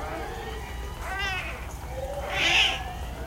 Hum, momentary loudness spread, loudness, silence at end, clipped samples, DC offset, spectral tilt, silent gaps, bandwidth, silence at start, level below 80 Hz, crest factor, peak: none; 16 LU; -27 LUFS; 0 s; under 0.1%; under 0.1%; -2.5 dB/octave; none; 16 kHz; 0 s; -38 dBFS; 20 dB; -10 dBFS